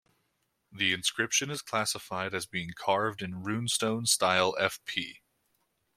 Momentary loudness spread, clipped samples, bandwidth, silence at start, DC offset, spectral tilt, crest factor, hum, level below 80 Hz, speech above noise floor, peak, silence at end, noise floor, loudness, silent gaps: 9 LU; under 0.1%; 16.5 kHz; 0.7 s; under 0.1%; -2.5 dB/octave; 24 dB; none; -70 dBFS; 47 dB; -8 dBFS; 0.85 s; -77 dBFS; -29 LUFS; none